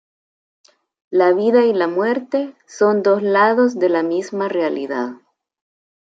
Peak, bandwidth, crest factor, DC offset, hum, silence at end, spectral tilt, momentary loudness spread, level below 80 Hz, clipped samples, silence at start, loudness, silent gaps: -2 dBFS; 7.8 kHz; 16 dB; under 0.1%; none; 0.95 s; -6 dB/octave; 9 LU; -74 dBFS; under 0.1%; 1.1 s; -17 LUFS; none